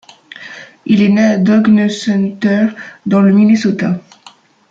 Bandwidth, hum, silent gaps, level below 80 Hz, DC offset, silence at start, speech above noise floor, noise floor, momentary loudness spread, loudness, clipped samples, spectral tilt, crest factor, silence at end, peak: 7.6 kHz; none; none; -56 dBFS; under 0.1%; 0.4 s; 32 dB; -43 dBFS; 19 LU; -12 LUFS; under 0.1%; -7 dB/octave; 12 dB; 0.7 s; -2 dBFS